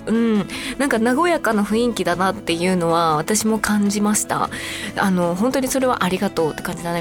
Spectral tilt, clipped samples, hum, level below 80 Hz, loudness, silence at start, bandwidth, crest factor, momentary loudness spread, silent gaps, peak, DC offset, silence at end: -4.5 dB/octave; under 0.1%; none; -46 dBFS; -19 LUFS; 0 s; 18 kHz; 16 dB; 5 LU; none; -4 dBFS; under 0.1%; 0 s